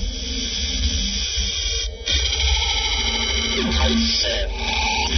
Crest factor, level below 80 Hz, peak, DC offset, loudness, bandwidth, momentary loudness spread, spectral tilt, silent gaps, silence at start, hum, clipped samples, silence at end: 16 dB; -26 dBFS; -6 dBFS; under 0.1%; -20 LUFS; 6.4 kHz; 5 LU; -2.5 dB/octave; none; 0 s; none; under 0.1%; 0 s